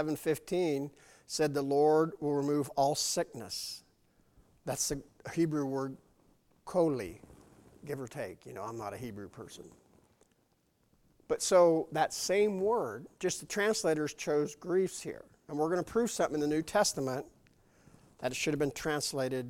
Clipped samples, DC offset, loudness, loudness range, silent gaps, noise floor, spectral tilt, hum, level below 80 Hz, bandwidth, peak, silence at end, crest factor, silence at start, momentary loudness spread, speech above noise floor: under 0.1%; under 0.1%; -32 LUFS; 10 LU; none; -73 dBFS; -4 dB/octave; none; -66 dBFS; 17 kHz; -14 dBFS; 0 s; 20 dB; 0 s; 15 LU; 41 dB